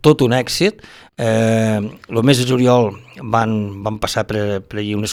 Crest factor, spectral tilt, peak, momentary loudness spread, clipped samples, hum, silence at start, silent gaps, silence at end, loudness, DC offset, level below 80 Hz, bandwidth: 16 dB; -5.5 dB/octave; 0 dBFS; 9 LU; under 0.1%; none; 0.05 s; none; 0 s; -17 LUFS; under 0.1%; -46 dBFS; 16.5 kHz